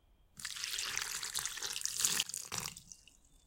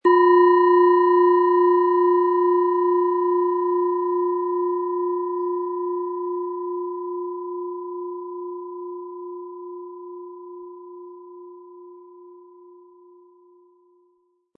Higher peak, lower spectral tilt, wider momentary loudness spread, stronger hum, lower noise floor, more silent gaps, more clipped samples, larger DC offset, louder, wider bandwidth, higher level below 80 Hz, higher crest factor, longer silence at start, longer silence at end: second, -12 dBFS vs -6 dBFS; second, 1 dB/octave vs -7.5 dB/octave; second, 20 LU vs 23 LU; neither; about the same, -64 dBFS vs -66 dBFS; neither; neither; neither; second, -36 LUFS vs -20 LUFS; first, 17 kHz vs 4.4 kHz; first, -68 dBFS vs -88 dBFS; first, 28 dB vs 16 dB; first, 0.35 s vs 0.05 s; second, 0.1 s vs 2.2 s